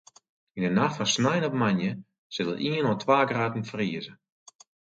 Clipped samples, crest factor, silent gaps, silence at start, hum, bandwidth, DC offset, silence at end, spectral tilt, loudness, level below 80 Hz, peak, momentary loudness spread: under 0.1%; 20 dB; 2.18-2.30 s; 0.55 s; none; 9.2 kHz; under 0.1%; 0.85 s; -5 dB/octave; -26 LUFS; -66 dBFS; -8 dBFS; 14 LU